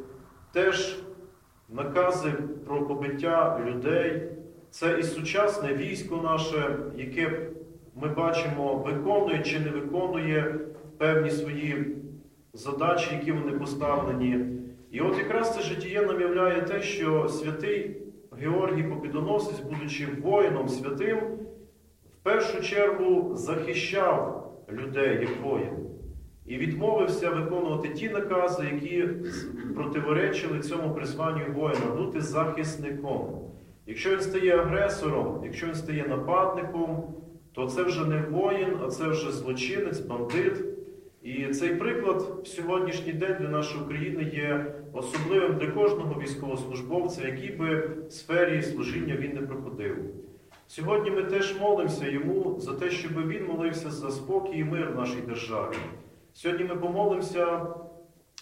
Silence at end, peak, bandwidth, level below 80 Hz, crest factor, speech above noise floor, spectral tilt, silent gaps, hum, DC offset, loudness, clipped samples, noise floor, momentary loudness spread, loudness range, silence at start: 0 s; -10 dBFS; 15.5 kHz; -58 dBFS; 18 dB; 30 dB; -6 dB/octave; none; none; under 0.1%; -29 LUFS; under 0.1%; -58 dBFS; 11 LU; 3 LU; 0 s